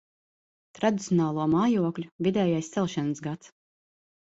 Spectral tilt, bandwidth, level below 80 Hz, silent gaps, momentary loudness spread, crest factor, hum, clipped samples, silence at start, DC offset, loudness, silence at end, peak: -6.5 dB/octave; 8 kHz; -66 dBFS; 2.12-2.19 s; 8 LU; 18 dB; none; under 0.1%; 0.8 s; under 0.1%; -27 LUFS; 0.85 s; -10 dBFS